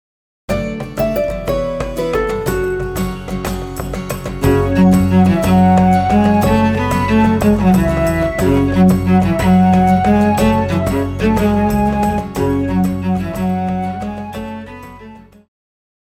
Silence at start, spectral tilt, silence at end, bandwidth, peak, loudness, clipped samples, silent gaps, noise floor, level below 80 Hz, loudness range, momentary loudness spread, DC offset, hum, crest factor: 0.5 s; -7.5 dB/octave; 0.85 s; 19 kHz; -2 dBFS; -15 LUFS; under 0.1%; none; -38 dBFS; -30 dBFS; 7 LU; 12 LU; under 0.1%; none; 12 dB